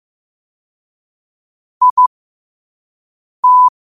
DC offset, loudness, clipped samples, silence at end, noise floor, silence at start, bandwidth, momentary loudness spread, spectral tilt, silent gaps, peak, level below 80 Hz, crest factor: under 0.1%; -11 LUFS; under 0.1%; 0.3 s; under -90 dBFS; 1.8 s; 1.3 kHz; 6 LU; -1 dB/octave; 1.90-1.97 s, 2.07-3.43 s; -2 dBFS; -70 dBFS; 14 dB